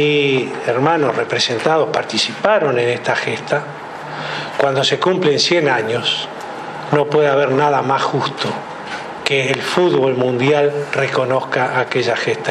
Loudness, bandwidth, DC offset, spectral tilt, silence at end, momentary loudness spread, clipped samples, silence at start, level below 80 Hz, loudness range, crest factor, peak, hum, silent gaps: -16 LUFS; 11.5 kHz; under 0.1%; -4.5 dB/octave; 0 s; 10 LU; under 0.1%; 0 s; -64 dBFS; 2 LU; 16 dB; 0 dBFS; none; none